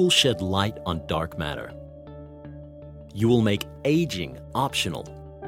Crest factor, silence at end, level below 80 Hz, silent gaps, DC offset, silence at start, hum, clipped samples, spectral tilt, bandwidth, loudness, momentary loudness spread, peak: 20 dB; 0 s; -48 dBFS; none; under 0.1%; 0 s; none; under 0.1%; -4.5 dB/octave; 16.5 kHz; -25 LUFS; 22 LU; -6 dBFS